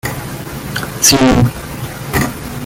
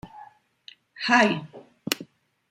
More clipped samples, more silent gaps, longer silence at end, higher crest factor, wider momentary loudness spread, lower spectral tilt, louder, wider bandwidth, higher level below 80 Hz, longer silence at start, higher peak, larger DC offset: neither; neither; second, 0 s vs 0.45 s; second, 16 dB vs 26 dB; second, 16 LU vs 24 LU; about the same, -3.5 dB/octave vs -3.5 dB/octave; first, -13 LUFS vs -24 LUFS; first, 19 kHz vs 16 kHz; first, -30 dBFS vs -68 dBFS; about the same, 0.05 s vs 0.05 s; about the same, 0 dBFS vs -2 dBFS; neither